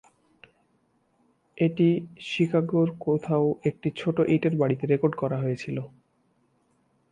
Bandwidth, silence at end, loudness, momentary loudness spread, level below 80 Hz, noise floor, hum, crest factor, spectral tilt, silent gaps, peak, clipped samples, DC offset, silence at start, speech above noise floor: 9.4 kHz; 1.25 s; -26 LUFS; 8 LU; -66 dBFS; -68 dBFS; none; 18 dB; -8.5 dB/octave; none; -10 dBFS; under 0.1%; under 0.1%; 1.55 s; 44 dB